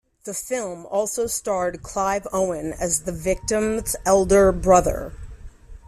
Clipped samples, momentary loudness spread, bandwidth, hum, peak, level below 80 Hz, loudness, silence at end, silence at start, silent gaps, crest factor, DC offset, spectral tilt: under 0.1%; 11 LU; 14.5 kHz; none; -4 dBFS; -38 dBFS; -22 LUFS; 0.1 s; 0.25 s; none; 18 dB; under 0.1%; -4.5 dB/octave